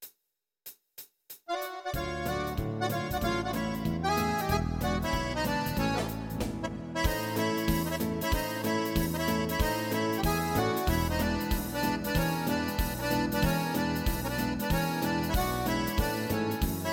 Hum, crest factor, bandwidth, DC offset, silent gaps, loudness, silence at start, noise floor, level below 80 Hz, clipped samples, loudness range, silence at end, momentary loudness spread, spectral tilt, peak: none; 18 dB; 17 kHz; under 0.1%; none; -30 LUFS; 0 s; -84 dBFS; -40 dBFS; under 0.1%; 2 LU; 0 s; 7 LU; -5 dB/octave; -14 dBFS